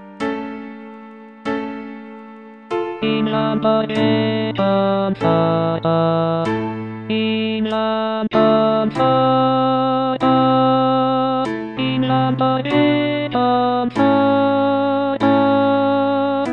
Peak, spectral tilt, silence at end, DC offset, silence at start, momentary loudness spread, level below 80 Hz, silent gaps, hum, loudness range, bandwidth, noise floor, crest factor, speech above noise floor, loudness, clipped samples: -4 dBFS; -8 dB/octave; 0 s; under 0.1%; 0 s; 11 LU; -56 dBFS; none; none; 5 LU; 7.6 kHz; -38 dBFS; 14 dB; 21 dB; -17 LUFS; under 0.1%